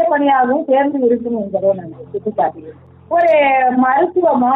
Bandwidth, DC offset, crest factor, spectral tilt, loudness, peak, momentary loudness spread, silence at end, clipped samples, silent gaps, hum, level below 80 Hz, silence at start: 4.7 kHz; under 0.1%; 10 dB; -8.5 dB/octave; -15 LUFS; -4 dBFS; 9 LU; 0 s; under 0.1%; none; none; -60 dBFS; 0 s